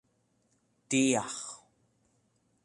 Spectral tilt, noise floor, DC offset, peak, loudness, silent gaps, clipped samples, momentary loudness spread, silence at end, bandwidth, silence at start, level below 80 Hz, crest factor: -3.5 dB/octave; -73 dBFS; under 0.1%; -14 dBFS; -30 LUFS; none; under 0.1%; 18 LU; 1.1 s; 11.5 kHz; 0.9 s; -76 dBFS; 22 dB